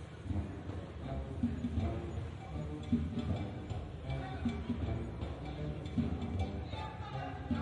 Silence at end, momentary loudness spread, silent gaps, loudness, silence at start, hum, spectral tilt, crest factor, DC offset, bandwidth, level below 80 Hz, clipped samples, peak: 0 s; 6 LU; none; -40 LUFS; 0 s; none; -8 dB/octave; 18 dB; under 0.1%; 10 kHz; -48 dBFS; under 0.1%; -20 dBFS